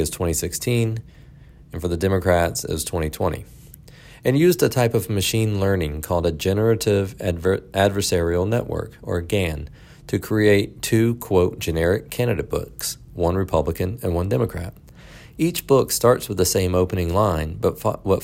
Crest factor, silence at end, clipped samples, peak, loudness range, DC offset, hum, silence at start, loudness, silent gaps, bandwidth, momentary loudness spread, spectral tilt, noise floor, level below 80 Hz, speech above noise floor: 18 dB; 0 s; under 0.1%; -4 dBFS; 3 LU; under 0.1%; none; 0 s; -21 LUFS; none; 16.5 kHz; 10 LU; -5.5 dB/octave; -45 dBFS; -42 dBFS; 25 dB